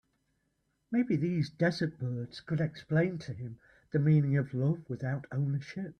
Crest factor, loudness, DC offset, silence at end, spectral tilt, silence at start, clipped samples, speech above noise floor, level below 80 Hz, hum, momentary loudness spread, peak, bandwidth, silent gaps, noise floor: 14 dB; -32 LUFS; under 0.1%; 0.05 s; -8.5 dB/octave; 0.9 s; under 0.1%; 47 dB; -66 dBFS; none; 11 LU; -16 dBFS; 6.6 kHz; none; -78 dBFS